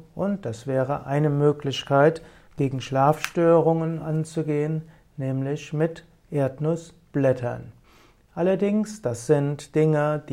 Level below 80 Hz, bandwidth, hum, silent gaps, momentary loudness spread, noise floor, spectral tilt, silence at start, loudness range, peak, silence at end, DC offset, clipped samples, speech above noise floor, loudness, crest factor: -58 dBFS; 16 kHz; none; none; 12 LU; -55 dBFS; -7 dB/octave; 0.15 s; 5 LU; -6 dBFS; 0 s; under 0.1%; under 0.1%; 32 dB; -24 LUFS; 18 dB